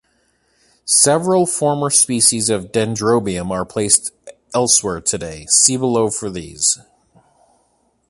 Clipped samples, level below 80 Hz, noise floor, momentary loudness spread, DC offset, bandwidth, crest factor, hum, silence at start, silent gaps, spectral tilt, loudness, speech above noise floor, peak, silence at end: under 0.1%; -48 dBFS; -62 dBFS; 12 LU; under 0.1%; 16 kHz; 18 dB; none; 0.85 s; none; -3 dB/octave; -15 LUFS; 45 dB; 0 dBFS; 1.35 s